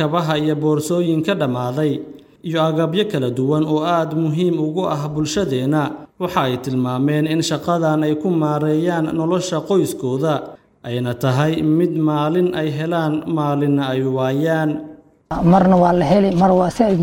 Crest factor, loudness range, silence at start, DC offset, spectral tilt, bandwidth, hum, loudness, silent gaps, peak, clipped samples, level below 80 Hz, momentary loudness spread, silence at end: 16 dB; 3 LU; 0 s; under 0.1%; -7 dB/octave; 17 kHz; none; -18 LUFS; none; -2 dBFS; under 0.1%; -48 dBFS; 7 LU; 0 s